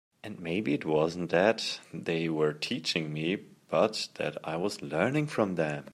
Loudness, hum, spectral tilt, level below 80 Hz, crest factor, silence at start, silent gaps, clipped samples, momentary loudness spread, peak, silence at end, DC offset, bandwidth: -30 LUFS; none; -5 dB/octave; -70 dBFS; 22 dB; 0.25 s; none; under 0.1%; 8 LU; -10 dBFS; 0 s; under 0.1%; 14.5 kHz